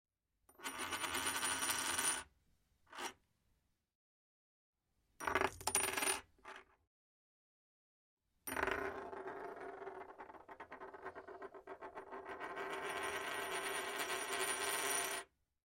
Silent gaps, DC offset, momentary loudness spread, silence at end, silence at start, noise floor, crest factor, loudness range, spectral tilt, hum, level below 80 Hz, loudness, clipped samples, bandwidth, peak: 3.95-4.73 s, 6.87-8.17 s; under 0.1%; 18 LU; 0.4 s; 0.6 s; -81 dBFS; 26 dB; 10 LU; -0.5 dB/octave; none; -72 dBFS; -40 LUFS; under 0.1%; 16 kHz; -18 dBFS